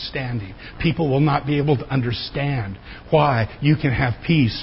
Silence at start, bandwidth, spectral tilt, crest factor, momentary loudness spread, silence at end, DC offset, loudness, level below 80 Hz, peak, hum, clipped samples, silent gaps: 0 s; 5.8 kHz; -11.5 dB/octave; 16 dB; 10 LU; 0 s; under 0.1%; -21 LUFS; -40 dBFS; -4 dBFS; none; under 0.1%; none